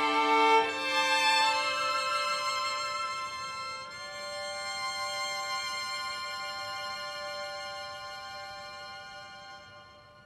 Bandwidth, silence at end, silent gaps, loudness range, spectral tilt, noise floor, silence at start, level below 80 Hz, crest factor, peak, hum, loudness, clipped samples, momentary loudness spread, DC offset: 15.5 kHz; 0 s; none; 12 LU; -0.5 dB/octave; -53 dBFS; 0 s; -70 dBFS; 20 dB; -12 dBFS; none; -30 LUFS; under 0.1%; 18 LU; under 0.1%